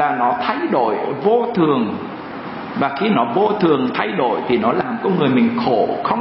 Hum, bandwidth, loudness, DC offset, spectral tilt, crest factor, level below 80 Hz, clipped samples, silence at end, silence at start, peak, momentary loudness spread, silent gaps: none; 5.8 kHz; -18 LUFS; under 0.1%; -11.5 dB/octave; 16 dB; -58 dBFS; under 0.1%; 0 s; 0 s; -2 dBFS; 8 LU; none